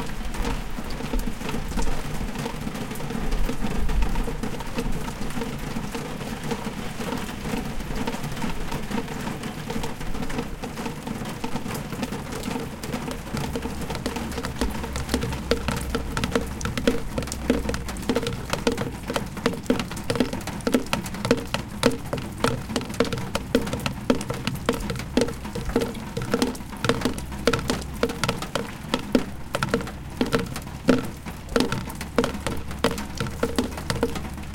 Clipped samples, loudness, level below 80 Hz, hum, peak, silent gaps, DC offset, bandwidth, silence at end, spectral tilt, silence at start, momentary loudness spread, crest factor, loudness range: under 0.1%; -28 LUFS; -34 dBFS; none; 0 dBFS; none; under 0.1%; 17 kHz; 0 s; -5 dB/octave; 0 s; 7 LU; 26 dB; 5 LU